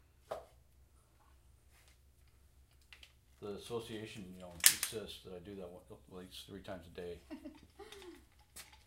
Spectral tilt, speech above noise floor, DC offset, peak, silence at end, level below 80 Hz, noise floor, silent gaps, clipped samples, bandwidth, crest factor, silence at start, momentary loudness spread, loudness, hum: -1 dB/octave; 25 dB; under 0.1%; -4 dBFS; 0.05 s; -66 dBFS; -67 dBFS; none; under 0.1%; 16 kHz; 40 dB; 0.25 s; 28 LU; -38 LUFS; none